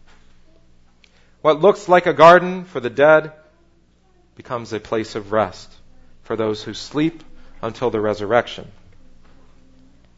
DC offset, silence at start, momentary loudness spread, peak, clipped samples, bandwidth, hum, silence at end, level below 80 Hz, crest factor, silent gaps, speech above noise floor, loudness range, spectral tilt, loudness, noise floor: under 0.1%; 1.45 s; 19 LU; 0 dBFS; under 0.1%; 8 kHz; 60 Hz at -55 dBFS; 1.5 s; -48 dBFS; 20 dB; none; 38 dB; 10 LU; -6 dB/octave; -17 LUFS; -55 dBFS